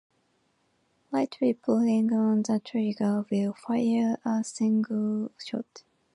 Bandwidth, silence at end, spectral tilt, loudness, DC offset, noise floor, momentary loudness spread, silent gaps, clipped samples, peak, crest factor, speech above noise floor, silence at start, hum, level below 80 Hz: 11 kHz; 0.35 s; -6.5 dB/octave; -27 LUFS; under 0.1%; -71 dBFS; 9 LU; none; under 0.1%; -12 dBFS; 14 dB; 44 dB; 1.1 s; none; -78 dBFS